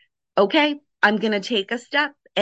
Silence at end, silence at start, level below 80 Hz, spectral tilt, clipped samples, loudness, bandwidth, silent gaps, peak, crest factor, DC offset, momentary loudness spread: 0 s; 0.35 s; -72 dBFS; -4.5 dB/octave; under 0.1%; -21 LUFS; 8.4 kHz; none; -4 dBFS; 18 dB; under 0.1%; 6 LU